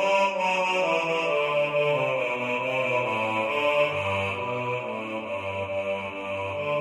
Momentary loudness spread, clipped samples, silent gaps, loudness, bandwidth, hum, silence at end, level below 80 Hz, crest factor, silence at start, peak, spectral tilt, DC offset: 8 LU; under 0.1%; none; -26 LUFS; 12.5 kHz; none; 0 s; -70 dBFS; 14 dB; 0 s; -12 dBFS; -4.5 dB/octave; under 0.1%